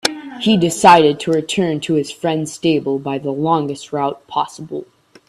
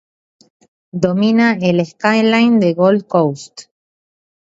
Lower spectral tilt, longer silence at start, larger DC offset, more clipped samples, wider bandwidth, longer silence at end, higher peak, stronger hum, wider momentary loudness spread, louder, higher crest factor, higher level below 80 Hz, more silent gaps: second, -5 dB/octave vs -6.5 dB/octave; second, 0.05 s vs 0.95 s; neither; neither; first, 13.5 kHz vs 7.8 kHz; second, 0.45 s vs 0.95 s; about the same, 0 dBFS vs 0 dBFS; neither; about the same, 12 LU vs 10 LU; about the same, -16 LUFS vs -14 LUFS; about the same, 16 dB vs 16 dB; about the same, -56 dBFS vs -58 dBFS; neither